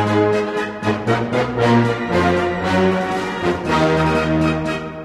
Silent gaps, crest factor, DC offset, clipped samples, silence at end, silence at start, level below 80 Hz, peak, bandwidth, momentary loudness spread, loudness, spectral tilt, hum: none; 14 dB; under 0.1%; under 0.1%; 0 s; 0 s; -40 dBFS; -2 dBFS; 13 kHz; 6 LU; -18 LUFS; -6.5 dB/octave; none